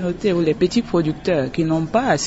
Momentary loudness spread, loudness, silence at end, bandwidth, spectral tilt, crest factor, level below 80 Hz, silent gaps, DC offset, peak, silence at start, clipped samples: 2 LU; -19 LUFS; 0 s; 8 kHz; -5.5 dB/octave; 14 dB; -44 dBFS; none; under 0.1%; -4 dBFS; 0 s; under 0.1%